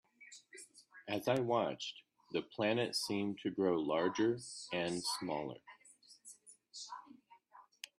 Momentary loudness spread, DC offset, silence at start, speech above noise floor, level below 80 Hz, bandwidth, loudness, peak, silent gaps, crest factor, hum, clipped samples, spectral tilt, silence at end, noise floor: 22 LU; under 0.1%; 0.2 s; 27 dB; -80 dBFS; 13 kHz; -37 LUFS; -20 dBFS; none; 20 dB; none; under 0.1%; -4.5 dB/octave; 0.35 s; -64 dBFS